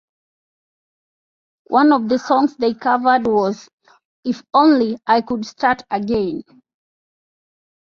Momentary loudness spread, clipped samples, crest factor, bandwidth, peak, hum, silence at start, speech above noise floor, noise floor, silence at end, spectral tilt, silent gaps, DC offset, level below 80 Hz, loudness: 12 LU; under 0.1%; 18 dB; 7.2 kHz; -2 dBFS; none; 1.7 s; over 73 dB; under -90 dBFS; 1.5 s; -6 dB/octave; 3.73-3.78 s, 4.05-4.23 s; under 0.1%; -56 dBFS; -17 LUFS